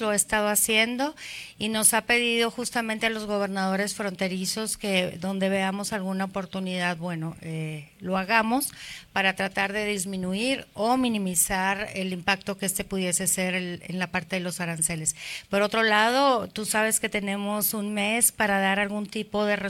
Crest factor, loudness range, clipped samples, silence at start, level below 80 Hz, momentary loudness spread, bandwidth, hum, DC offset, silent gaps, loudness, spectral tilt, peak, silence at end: 22 dB; 5 LU; under 0.1%; 0 s; -56 dBFS; 10 LU; 17 kHz; none; under 0.1%; none; -25 LUFS; -3 dB/octave; -6 dBFS; 0 s